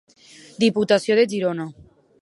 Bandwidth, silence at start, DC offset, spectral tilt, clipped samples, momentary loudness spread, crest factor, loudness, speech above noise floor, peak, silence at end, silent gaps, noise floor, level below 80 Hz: 11.5 kHz; 0.6 s; under 0.1%; -5 dB/octave; under 0.1%; 12 LU; 18 dB; -20 LUFS; 28 dB; -4 dBFS; 0.5 s; none; -48 dBFS; -62 dBFS